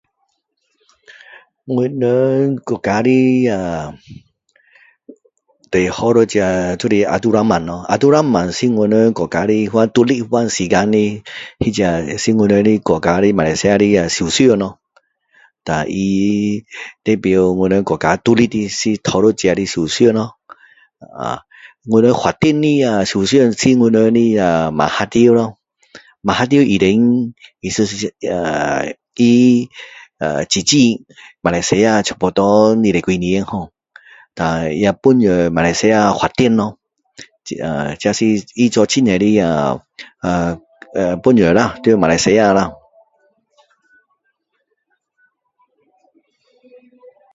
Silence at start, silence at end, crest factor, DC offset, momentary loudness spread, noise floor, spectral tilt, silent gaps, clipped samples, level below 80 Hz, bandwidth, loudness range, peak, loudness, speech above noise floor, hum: 1.65 s; 4.6 s; 16 dB; under 0.1%; 12 LU; -69 dBFS; -5.5 dB/octave; none; under 0.1%; -44 dBFS; 8 kHz; 4 LU; 0 dBFS; -14 LUFS; 55 dB; none